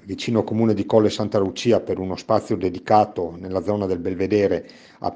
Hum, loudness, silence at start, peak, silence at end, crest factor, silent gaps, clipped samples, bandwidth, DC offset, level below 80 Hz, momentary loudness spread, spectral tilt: none; -21 LUFS; 0.05 s; -2 dBFS; 0 s; 18 dB; none; under 0.1%; 9.6 kHz; under 0.1%; -56 dBFS; 8 LU; -6.5 dB/octave